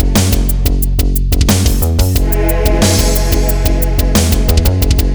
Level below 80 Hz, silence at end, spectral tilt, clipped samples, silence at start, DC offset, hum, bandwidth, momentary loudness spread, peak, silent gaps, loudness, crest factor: -12 dBFS; 0 s; -5 dB/octave; under 0.1%; 0 s; under 0.1%; none; over 20 kHz; 4 LU; 0 dBFS; none; -13 LUFS; 10 dB